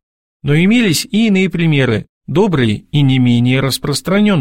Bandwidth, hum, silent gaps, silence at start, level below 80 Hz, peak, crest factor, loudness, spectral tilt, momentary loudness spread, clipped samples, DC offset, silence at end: 16.5 kHz; none; 2.09-2.21 s; 0.45 s; -42 dBFS; -2 dBFS; 12 dB; -13 LUFS; -6 dB/octave; 5 LU; under 0.1%; under 0.1%; 0 s